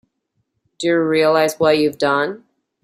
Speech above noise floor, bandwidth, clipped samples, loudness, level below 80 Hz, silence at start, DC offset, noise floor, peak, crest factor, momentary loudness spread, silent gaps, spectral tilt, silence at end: 55 dB; 15.5 kHz; under 0.1%; -17 LUFS; -62 dBFS; 0.8 s; under 0.1%; -71 dBFS; -2 dBFS; 16 dB; 9 LU; none; -4.5 dB/octave; 0.45 s